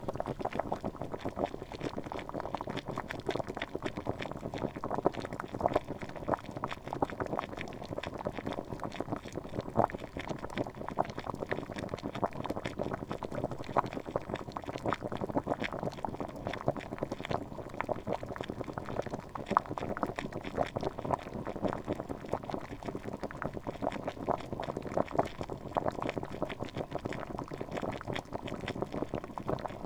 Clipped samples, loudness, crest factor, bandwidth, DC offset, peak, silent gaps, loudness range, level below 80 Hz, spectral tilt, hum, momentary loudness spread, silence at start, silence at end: under 0.1%; -38 LUFS; 30 dB; over 20 kHz; under 0.1%; -6 dBFS; none; 2 LU; -54 dBFS; -6.5 dB/octave; none; 7 LU; 0 s; 0 s